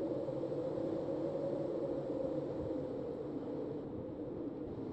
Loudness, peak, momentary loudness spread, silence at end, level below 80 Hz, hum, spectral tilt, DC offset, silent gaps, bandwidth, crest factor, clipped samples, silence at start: -40 LUFS; -26 dBFS; 5 LU; 0 s; -64 dBFS; none; -9.5 dB/octave; under 0.1%; none; 8.4 kHz; 12 dB; under 0.1%; 0 s